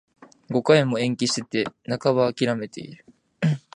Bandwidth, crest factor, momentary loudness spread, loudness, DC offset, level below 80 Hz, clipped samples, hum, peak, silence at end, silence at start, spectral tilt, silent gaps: 10.5 kHz; 22 dB; 12 LU; -23 LUFS; under 0.1%; -64 dBFS; under 0.1%; none; -2 dBFS; 0.2 s; 0.5 s; -5.5 dB/octave; none